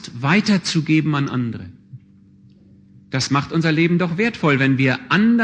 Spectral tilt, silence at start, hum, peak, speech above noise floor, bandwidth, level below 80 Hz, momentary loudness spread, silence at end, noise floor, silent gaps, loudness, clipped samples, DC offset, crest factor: -6 dB/octave; 0 s; none; -2 dBFS; 31 dB; 9.4 kHz; -56 dBFS; 9 LU; 0 s; -49 dBFS; none; -18 LUFS; under 0.1%; under 0.1%; 16 dB